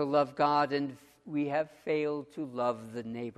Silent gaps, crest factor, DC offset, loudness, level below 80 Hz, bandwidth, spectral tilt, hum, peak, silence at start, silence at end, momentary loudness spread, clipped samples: none; 18 dB; under 0.1%; -32 LUFS; -74 dBFS; 13 kHz; -7 dB/octave; none; -14 dBFS; 0 s; 0.05 s; 12 LU; under 0.1%